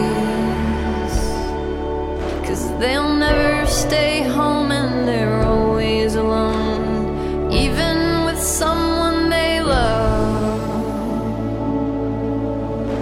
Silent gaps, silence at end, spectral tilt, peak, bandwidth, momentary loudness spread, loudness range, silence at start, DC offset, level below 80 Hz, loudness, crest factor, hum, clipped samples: none; 0 s; -5 dB/octave; -4 dBFS; 16.5 kHz; 6 LU; 3 LU; 0 s; 0.1%; -28 dBFS; -19 LUFS; 14 dB; none; under 0.1%